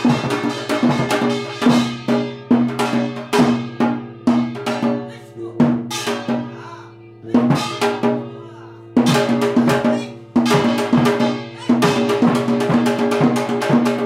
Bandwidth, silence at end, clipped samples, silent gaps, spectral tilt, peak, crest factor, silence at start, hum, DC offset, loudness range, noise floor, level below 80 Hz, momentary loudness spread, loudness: 15 kHz; 0 s; under 0.1%; none; -6 dB/octave; -2 dBFS; 14 dB; 0 s; none; under 0.1%; 4 LU; -39 dBFS; -56 dBFS; 10 LU; -18 LUFS